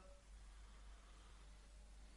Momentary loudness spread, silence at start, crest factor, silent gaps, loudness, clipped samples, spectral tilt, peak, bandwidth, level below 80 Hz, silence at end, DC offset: 1 LU; 0 s; 10 dB; none; -64 LUFS; under 0.1%; -4 dB/octave; -50 dBFS; 11.5 kHz; -62 dBFS; 0 s; under 0.1%